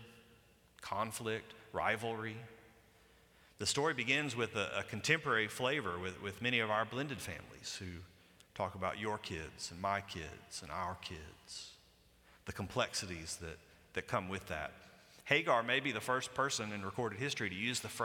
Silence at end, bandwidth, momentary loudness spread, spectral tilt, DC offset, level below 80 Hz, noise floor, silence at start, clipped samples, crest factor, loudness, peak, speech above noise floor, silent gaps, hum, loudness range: 0 s; 18.5 kHz; 15 LU; -3.5 dB/octave; under 0.1%; -66 dBFS; -67 dBFS; 0 s; under 0.1%; 26 dB; -38 LUFS; -14 dBFS; 28 dB; none; none; 8 LU